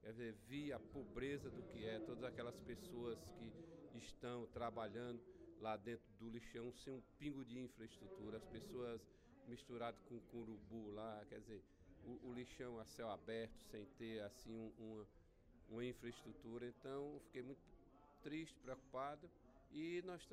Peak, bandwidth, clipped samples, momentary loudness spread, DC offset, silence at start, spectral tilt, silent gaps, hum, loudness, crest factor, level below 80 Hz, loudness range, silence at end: -34 dBFS; 15.5 kHz; under 0.1%; 9 LU; under 0.1%; 0 s; -6 dB/octave; none; none; -53 LUFS; 18 dB; -72 dBFS; 3 LU; 0 s